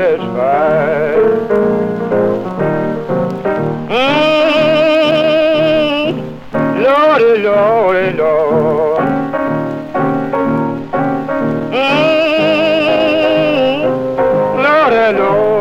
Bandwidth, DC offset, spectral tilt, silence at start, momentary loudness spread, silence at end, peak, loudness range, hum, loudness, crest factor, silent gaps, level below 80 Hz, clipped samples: 8.2 kHz; under 0.1%; -6.5 dB/octave; 0 s; 7 LU; 0 s; -2 dBFS; 3 LU; none; -12 LUFS; 10 dB; none; -46 dBFS; under 0.1%